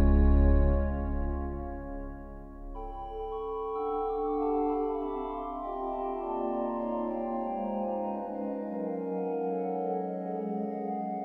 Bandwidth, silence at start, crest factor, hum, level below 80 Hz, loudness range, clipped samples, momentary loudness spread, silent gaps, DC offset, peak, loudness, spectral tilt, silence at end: 4.1 kHz; 0 s; 16 dB; none; -34 dBFS; 3 LU; under 0.1%; 12 LU; none; under 0.1%; -14 dBFS; -32 LUFS; -11.5 dB/octave; 0 s